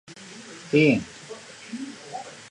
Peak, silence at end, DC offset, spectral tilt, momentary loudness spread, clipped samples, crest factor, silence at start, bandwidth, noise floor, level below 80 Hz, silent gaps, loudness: -6 dBFS; 0.1 s; under 0.1%; -6 dB/octave; 21 LU; under 0.1%; 20 dB; 0.1 s; 11 kHz; -43 dBFS; -64 dBFS; none; -23 LUFS